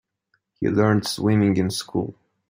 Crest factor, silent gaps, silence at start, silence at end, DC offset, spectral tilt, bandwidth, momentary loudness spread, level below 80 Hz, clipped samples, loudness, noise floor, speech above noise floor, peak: 18 dB; none; 0.6 s; 0.35 s; under 0.1%; -6 dB/octave; 16 kHz; 9 LU; -58 dBFS; under 0.1%; -22 LUFS; -71 dBFS; 51 dB; -4 dBFS